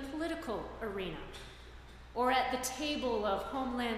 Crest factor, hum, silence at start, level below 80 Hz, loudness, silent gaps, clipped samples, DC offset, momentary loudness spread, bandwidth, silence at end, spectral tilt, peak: 18 dB; none; 0 s; -54 dBFS; -36 LUFS; none; under 0.1%; under 0.1%; 19 LU; 15.5 kHz; 0 s; -3.5 dB/octave; -18 dBFS